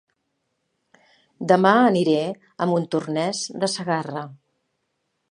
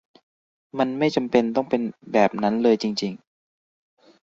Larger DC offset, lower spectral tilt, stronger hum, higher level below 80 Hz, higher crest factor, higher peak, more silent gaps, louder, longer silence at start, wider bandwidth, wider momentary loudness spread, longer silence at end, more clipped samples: neither; about the same, -5 dB/octave vs -6 dB/octave; neither; second, -74 dBFS vs -66 dBFS; about the same, 22 dB vs 20 dB; about the same, -2 dBFS vs -4 dBFS; neither; about the same, -21 LUFS vs -22 LUFS; first, 1.4 s vs 0.75 s; first, 11 kHz vs 7.8 kHz; first, 16 LU vs 9 LU; about the same, 0.95 s vs 1.05 s; neither